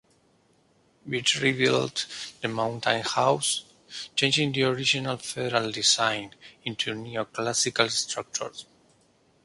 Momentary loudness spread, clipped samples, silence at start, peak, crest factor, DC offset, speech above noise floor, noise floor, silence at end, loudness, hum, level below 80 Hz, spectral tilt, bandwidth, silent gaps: 11 LU; under 0.1%; 1.05 s; -2 dBFS; 26 dB; under 0.1%; 37 dB; -64 dBFS; 0.8 s; -25 LUFS; none; -66 dBFS; -2.5 dB/octave; 11.5 kHz; none